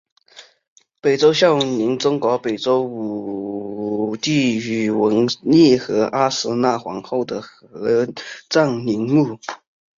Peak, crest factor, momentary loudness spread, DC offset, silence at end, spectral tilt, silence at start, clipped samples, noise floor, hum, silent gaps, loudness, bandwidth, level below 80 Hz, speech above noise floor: -2 dBFS; 16 dB; 13 LU; under 0.1%; 0.45 s; -5.5 dB/octave; 0.35 s; under 0.1%; -47 dBFS; none; 0.68-0.76 s; -19 LUFS; 7.6 kHz; -60 dBFS; 28 dB